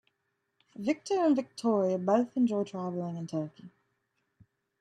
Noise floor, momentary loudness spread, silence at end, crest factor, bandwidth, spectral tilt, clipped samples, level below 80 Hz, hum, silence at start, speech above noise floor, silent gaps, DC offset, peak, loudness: -80 dBFS; 9 LU; 1.15 s; 18 dB; 11 kHz; -7 dB/octave; under 0.1%; -80 dBFS; none; 0.8 s; 51 dB; none; under 0.1%; -14 dBFS; -30 LUFS